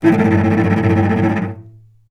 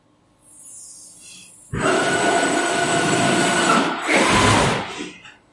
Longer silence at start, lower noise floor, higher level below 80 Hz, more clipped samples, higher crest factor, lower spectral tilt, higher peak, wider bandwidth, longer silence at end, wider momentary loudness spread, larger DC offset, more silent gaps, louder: second, 0 s vs 0.6 s; second, -42 dBFS vs -56 dBFS; about the same, -48 dBFS vs -44 dBFS; neither; about the same, 14 dB vs 18 dB; first, -9 dB/octave vs -3.5 dB/octave; about the same, 0 dBFS vs -2 dBFS; second, 7.2 kHz vs 11.5 kHz; first, 0.4 s vs 0.25 s; second, 11 LU vs 23 LU; neither; neither; first, -15 LUFS vs -18 LUFS